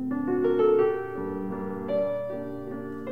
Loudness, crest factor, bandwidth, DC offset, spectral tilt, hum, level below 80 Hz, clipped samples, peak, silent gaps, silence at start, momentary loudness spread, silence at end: -27 LUFS; 14 dB; 4.6 kHz; 0.4%; -9 dB/octave; none; -62 dBFS; under 0.1%; -12 dBFS; none; 0 s; 13 LU; 0 s